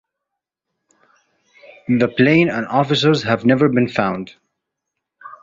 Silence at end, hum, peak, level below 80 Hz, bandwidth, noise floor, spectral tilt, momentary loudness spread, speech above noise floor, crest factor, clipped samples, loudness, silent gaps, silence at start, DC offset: 0.05 s; none; -2 dBFS; -56 dBFS; 7.6 kHz; -81 dBFS; -6.5 dB/octave; 11 LU; 65 dB; 18 dB; under 0.1%; -16 LUFS; none; 1.9 s; under 0.1%